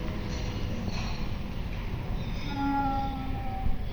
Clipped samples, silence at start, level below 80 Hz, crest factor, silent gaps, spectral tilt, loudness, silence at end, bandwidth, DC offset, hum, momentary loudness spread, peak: under 0.1%; 0 s; -34 dBFS; 14 dB; none; -6.5 dB/octave; -33 LUFS; 0 s; over 20 kHz; under 0.1%; none; 7 LU; -16 dBFS